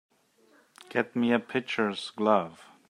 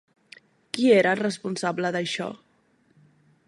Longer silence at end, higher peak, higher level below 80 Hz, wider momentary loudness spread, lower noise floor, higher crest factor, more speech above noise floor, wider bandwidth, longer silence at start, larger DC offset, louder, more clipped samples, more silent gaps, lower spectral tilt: second, 0.35 s vs 1.1 s; about the same, -8 dBFS vs -6 dBFS; about the same, -78 dBFS vs -74 dBFS; second, 6 LU vs 13 LU; about the same, -64 dBFS vs -64 dBFS; about the same, 22 dB vs 20 dB; second, 36 dB vs 41 dB; about the same, 11 kHz vs 11.5 kHz; first, 0.9 s vs 0.75 s; neither; second, -28 LUFS vs -24 LUFS; neither; neither; about the same, -5.5 dB/octave vs -5 dB/octave